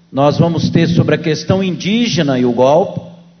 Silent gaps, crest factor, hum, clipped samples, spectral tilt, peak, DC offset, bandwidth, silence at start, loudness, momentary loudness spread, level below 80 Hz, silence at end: none; 14 dB; none; under 0.1%; -6.5 dB/octave; 0 dBFS; under 0.1%; 6.6 kHz; 0.1 s; -13 LUFS; 4 LU; -42 dBFS; 0.25 s